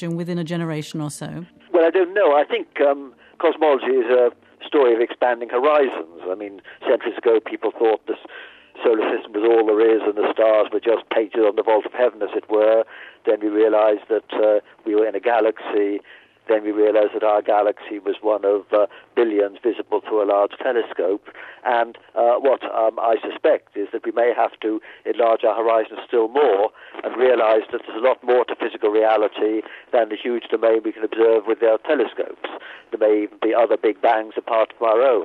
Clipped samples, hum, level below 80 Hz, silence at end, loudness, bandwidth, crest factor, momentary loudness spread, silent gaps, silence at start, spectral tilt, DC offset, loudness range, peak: under 0.1%; none; -74 dBFS; 0 s; -20 LUFS; 11 kHz; 14 dB; 11 LU; none; 0 s; -6 dB/octave; under 0.1%; 2 LU; -6 dBFS